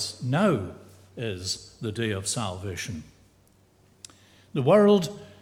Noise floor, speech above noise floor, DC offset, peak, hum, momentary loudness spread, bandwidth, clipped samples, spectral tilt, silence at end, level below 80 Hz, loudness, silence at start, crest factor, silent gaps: -60 dBFS; 35 dB; under 0.1%; -8 dBFS; none; 17 LU; 15.5 kHz; under 0.1%; -5 dB/octave; 0.1 s; -60 dBFS; -26 LUFS; 0 s; 20 dB; none